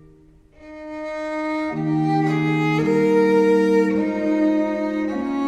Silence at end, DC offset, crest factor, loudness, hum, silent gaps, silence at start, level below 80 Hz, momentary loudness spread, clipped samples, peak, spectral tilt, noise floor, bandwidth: 0 s; under 0.1%; 14 dB; -20 LUFS; none; none; 0.6 s; -54 dBFS; 11 LU; under 0.1%; -6 dBFS; -7.5 dB/octave; -50 dBFS; 9.4 kHz